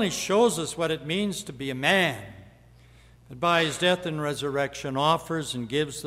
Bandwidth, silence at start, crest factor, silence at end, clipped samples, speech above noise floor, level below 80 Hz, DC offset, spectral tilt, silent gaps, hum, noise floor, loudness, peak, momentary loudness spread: 16 kHz; 0 s; 18 dB; 0 s; under 0.1%; 27 dB; -58 dBFS; under 0.1%; -4 dB/octave; none; none; -53 dBFS; -25 LUFS; -8 dBFS; 8 LU